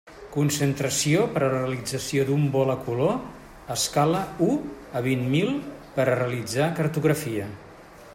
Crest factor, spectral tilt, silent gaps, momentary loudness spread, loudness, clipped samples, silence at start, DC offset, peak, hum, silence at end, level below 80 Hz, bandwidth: 18 dB; -5 dB/octave; none; 10 LU; -25 LUFS; under 0.1%; 0.05 s; under 0.1%; -8 dBFS; none; 0 s; -54 dBFS; 16 kHz